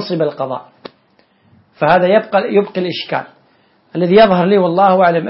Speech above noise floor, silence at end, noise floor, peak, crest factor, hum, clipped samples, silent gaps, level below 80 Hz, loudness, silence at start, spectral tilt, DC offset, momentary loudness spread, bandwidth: 42 dB; 0 s; -55 dBFS; 0 dBFS; 14 dB; none; under 0.1%; none; -52 dBFS; -13 LUFS; 0 s; -9.5 dB/octave; under 0.1%; 13 LU; 5.8 kHz